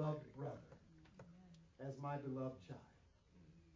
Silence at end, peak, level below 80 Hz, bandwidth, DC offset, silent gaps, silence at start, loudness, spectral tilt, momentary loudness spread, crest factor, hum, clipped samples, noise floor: 0 s; -32 dBFS; -74 dBFS; 7.2 kHz; under 0.1%; none; 0 s; -49 LUFS; -8 dB/octave; 21 LU; 18 dB; none; under 0.1%; -69 dBFS